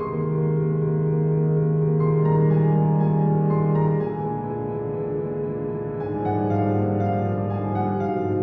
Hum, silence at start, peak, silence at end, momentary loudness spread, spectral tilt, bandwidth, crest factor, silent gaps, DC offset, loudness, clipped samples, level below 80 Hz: none; 0 s; -10 dBFS; 0 s; 8 LU; -12.5 dB/octave; 3 kHz; 12 dB; none; under 0.1%; -23 LUFS; under 0.1%; -52 dBFS